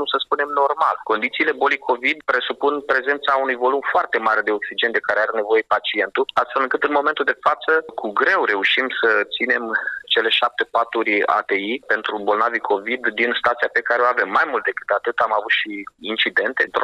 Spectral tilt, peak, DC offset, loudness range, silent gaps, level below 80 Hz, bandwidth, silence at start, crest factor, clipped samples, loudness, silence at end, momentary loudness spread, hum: -3.5 dB/octave; -6 dBFS; under 0.1%; 1 LU; none; -66 dBFS; 10.5 kHz; 0 s; 14 dB; under 0.1%; -19 LUFS; 0 s; 4 LU; none